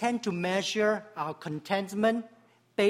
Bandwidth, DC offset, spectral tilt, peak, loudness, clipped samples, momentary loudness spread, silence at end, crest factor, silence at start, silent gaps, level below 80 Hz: 15.5 kHz; under 0.1%; -4.5 dB/octave; -12 dBFS; -30 LUFS; under 0.1%; 10 LU; 0 s; 18 dB; 0 s; none; -74 dBFS